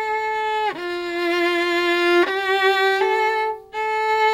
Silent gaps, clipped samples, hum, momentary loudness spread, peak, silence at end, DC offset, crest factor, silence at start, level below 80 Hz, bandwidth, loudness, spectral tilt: none; under 0.1%; none; 7 LU; -6 dBFS; 0 s; under 0.1%; 14 dB; 0 s; -60 dBFS; 15.5 kHz; -20 LUFS; -2.5 dB/octave